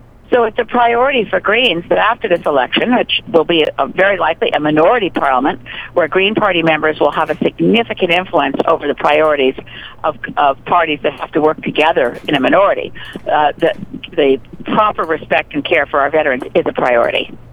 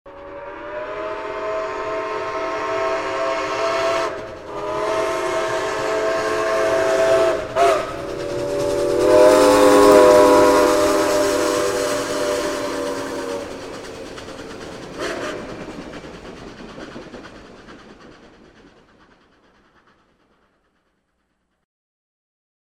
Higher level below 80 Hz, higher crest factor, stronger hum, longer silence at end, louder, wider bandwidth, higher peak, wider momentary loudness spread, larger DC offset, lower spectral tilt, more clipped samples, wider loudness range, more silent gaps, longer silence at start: about the same, -44 dBFS vs -46 dBFS; about the same, 14 dB vs 18 dB; neither; second, 0 s vs 4.6 s; first, -14 LUFS vs -18 LUFS; second, 11.5 kHz vs 16.5 kHz; about the same, 0 dBFS vs 0 dBFS; second, 7 LU vs 22 LU; neither; first, -6.5 dB/octave vs -3.5 dB/octave; neither; second, 2 LU vs 19 LU; neither; first, 0.3 s vs 0.05 s